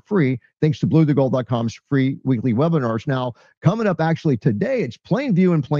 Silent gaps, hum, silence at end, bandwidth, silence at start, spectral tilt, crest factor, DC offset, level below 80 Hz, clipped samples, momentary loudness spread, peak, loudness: 3.57-3.61 s; none; 0 s; 7 kHz; 0.1 s; -8.5 dB/octave; 16 dB; under 0.1%; -58 dBFS; under 0.1%; 6 LU; -4 dBFS; -20 LUFS